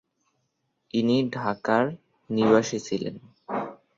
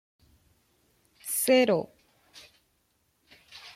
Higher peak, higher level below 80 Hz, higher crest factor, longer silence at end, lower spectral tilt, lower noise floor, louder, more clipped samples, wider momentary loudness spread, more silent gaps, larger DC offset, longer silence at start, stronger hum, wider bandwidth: first, -6 dBFS vs -10 dBFS; first, -66 dBFS vs -72 dBFS; about the same, 20 dB vs 20 dB; first, 0.2 s vs 0.05 s; first, -5.5 dB/octave vs -3 dB/octave; first, -76 dBFS vs -72 dBFS; about the same, -26 LUFS vs -25 LUFS; neither; second, 13 LU vs 25 LU; neither; neither; second, 0.95 s vs 1.25 s; neither; second, 7.6 kHz vs 16.5 kHz